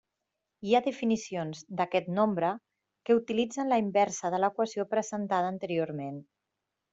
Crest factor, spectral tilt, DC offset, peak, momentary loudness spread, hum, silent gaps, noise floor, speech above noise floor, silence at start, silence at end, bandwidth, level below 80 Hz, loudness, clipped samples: 18 dB; -5.5 dB/octave; under 0.1%; -12 dBFS; 10 LU; none; none; -85 dBFS; 56 dB; 0.6 s; 0.7 s; 8 kHz; -74 dBFS; -30 LUFS; under 0.1%